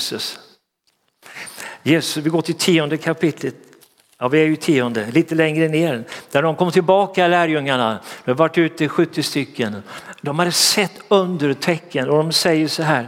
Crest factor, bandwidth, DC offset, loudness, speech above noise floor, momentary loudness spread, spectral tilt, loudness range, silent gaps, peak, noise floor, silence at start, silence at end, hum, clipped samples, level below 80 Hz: 18 dB; 16.5 kHz; under 0.1%; -18 LUFS; 49 dB; 12 LU; -4.5 dB/octave; 3 LU; none; -2 dBFS; -67 dBFS; 0 s; 0 s; none; under 0.1%; -68 dBFS